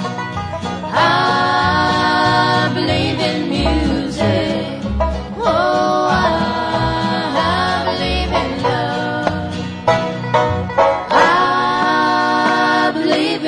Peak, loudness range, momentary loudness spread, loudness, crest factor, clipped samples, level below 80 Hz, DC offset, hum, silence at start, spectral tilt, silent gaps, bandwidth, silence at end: -2 dBFS; 3 LU; 7 LU; -16 LUFS; 14 dB; under 0.1%; -32 dBFS; under 0.1%; none; 0 s; -5.5 dB/octave; none; 10.5 kHz; 0 s